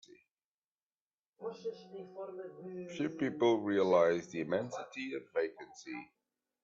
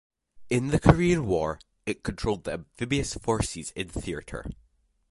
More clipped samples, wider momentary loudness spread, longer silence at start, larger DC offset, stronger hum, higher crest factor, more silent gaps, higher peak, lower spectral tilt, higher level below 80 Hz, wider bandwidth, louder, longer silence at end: neither; about the same, 17 LU vs 15 LU; first, 1.4 s vs 0.35 s; neither; neither; second, 20 dB vs 26 dB; neither; second, -16 dBFS vs -2 dBFS; about the same, -6 dB/octave vs -6 dB/octave; second, -80 dBFS vs -42 dBFS; second, 7.6 kHz vs 11.5 kHz; second, -35 LUFS vs -27 LUFS; about the same, 0.6 s vs 0.6 s